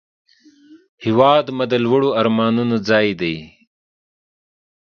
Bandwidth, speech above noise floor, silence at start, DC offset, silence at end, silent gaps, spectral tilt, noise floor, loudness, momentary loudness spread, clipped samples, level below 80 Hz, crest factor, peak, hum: 6.8 kHz; 31 dB; 0.7 s; under 0.1%; 1.4 s; 0.89-0.98 s; -7 dB/octave; -48 dBFS; -17 LUFS; 10 LU; under 0.1%; -58 dBFS; 18 dB; 0 dBFS; none